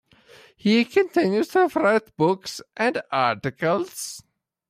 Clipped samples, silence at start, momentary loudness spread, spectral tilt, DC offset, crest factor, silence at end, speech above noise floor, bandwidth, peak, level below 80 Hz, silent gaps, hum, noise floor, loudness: under 0.1%; 0.65 s; 12 LU; -5 dB/octave; under 0.1%; 16 dB; 0.5 s; 30 dB; 16 kHz; -8 dBFS; -66 dBFS; none; none; -52 dBFS; -22 LUFS